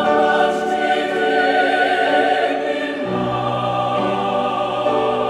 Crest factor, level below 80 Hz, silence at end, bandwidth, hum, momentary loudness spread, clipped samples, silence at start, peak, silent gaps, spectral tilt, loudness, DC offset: 14 dB; -54 dBFS; 0 s; 12.5 kHz; none; 5 LU; under 0.1%; 0 s; -4 dBFS; none; -5.5 dB/octave; -18 LUFS; under 0.1%